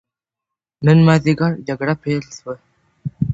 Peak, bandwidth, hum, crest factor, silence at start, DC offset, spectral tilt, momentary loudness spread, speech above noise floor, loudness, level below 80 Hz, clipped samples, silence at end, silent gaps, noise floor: 0 dBFS; 8 kHz; none; 18 dB; 0.8 s; under 0.1%; -7.5 dB/octave; 20 LU; 69 dB; -16 LUFS; -46 dBFS; under 0.1%; 0 s; none; -85 dBFS